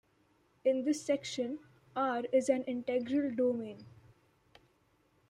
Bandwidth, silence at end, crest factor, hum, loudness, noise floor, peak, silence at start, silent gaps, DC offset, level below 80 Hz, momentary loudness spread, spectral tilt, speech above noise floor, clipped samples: 11.5 kHz; 1.4 s; 18 dB; none; -34 LUFS; -72 dBFS; -16 dBFS; 0.65 s; none; under 0.1%; -78 dBFS; 11 LU; -4.5 dB/octave; 39 dB; under 0.1%